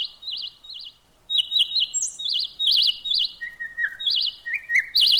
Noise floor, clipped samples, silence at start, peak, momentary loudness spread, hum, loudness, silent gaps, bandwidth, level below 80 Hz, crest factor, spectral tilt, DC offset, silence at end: -45 dBFS; under 0.1%; 0 s; -12 dBFS; 16 LU; none; -21 LUFS; none; over 20 kHz; -62 dBFS; 14 dB; 4 dB/octave; under 0.1%; 0 s